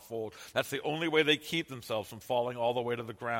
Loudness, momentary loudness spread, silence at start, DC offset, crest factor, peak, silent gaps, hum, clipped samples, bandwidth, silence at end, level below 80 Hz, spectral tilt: -32 LUFS; 10 LU; 0 s; under 0.1%; 20 dB; -14 dBFS; none; none; under 0.1%; 16.5 kHz; 0 s; -72 dBFS; -4 dB/octave